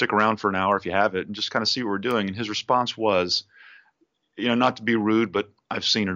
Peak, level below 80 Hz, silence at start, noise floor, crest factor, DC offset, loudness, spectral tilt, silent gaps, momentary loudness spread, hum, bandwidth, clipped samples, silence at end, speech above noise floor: -6 dBFS; -66 dBFS; 0 s; -68 dBFS; 18 dB; under 0.1%; -23 LUFS; -2.5 dB/octave; none; 6 LU; none; 7.8 kHz; under 0.1%; 0 s; 44 dB